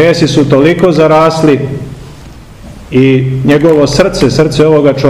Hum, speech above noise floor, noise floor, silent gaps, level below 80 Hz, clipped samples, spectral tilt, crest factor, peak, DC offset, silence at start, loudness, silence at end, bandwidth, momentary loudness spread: none; 23 dB; -30 dBFS; none; -32 dBFS; 5%; -6.5 dB/octave; 8 dB; 0 dBFS; 0.7%; 0 s; -8 LUFS; 0 s; 13.5 kHz; 7 LU